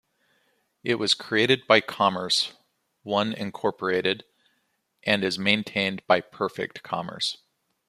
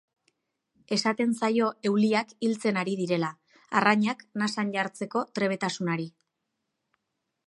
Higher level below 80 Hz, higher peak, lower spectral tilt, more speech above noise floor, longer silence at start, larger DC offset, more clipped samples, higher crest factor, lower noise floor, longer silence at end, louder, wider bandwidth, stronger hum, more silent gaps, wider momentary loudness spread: first, -68 dBFS vs -78 dBFS; first, -2 dBFS vs -6 dBFS; second, -3.5 dB/octave vs -5 dB/octave; second, 48 dB vs 55 dB; about the same, 0.85 s vs 0.9 s; neither; neither; about the same, 24 dB vs 22 dB; second, -73 dBFS vs -82 dBFS; second, 0.55 s vs 1.4 s; about the same, -25 LUFS vs -27 LUFS; first, 15 kHz vs 11.5 kHz; neither; neither; first, 11 LU vs 7 LU